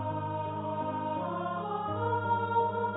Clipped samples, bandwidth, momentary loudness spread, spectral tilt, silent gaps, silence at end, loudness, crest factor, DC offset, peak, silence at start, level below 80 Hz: under 0.1%; 3.9 kHz; 6 LU; -4 dB/octave; none; 0 s; -32 LUFS; 14 dB; under 0.1%; -18 dBFS; 0 s; -62 dBFS